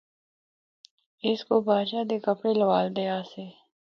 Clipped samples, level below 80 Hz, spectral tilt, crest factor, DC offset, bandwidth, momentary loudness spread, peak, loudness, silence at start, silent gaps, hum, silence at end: under 0.1%; -76 dBFS; -7.5 dB/octave; 18 dB; under 0.1%; 6.6 kHz; 14 LU; -10 dBFS; -26 LUFS; 1.25 s; none; none; 0.35 s